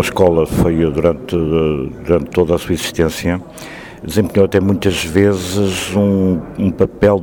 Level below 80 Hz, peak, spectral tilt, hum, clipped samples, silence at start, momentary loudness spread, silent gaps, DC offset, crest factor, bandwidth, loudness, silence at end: -34 dBFS; 0 dBFS; -6 dB/octave; none; under 0.1%; 0 s; 7 LU; none; under 0.1%; 14 dB; 19 kHz; -15 LUFS; 0 s